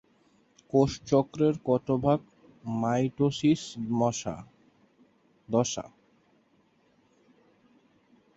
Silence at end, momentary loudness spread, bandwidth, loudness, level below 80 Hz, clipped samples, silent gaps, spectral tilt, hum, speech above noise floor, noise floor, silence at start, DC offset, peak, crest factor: 2.5 s; 12 LU; 8 kHz; -28 LUFS; -60 dBFS; under 0.1%; none; -6 dB/octave; none; 40 dB; -66 dBFS; 0.75 s; under 0.1%; -10 dBFS; 20 dB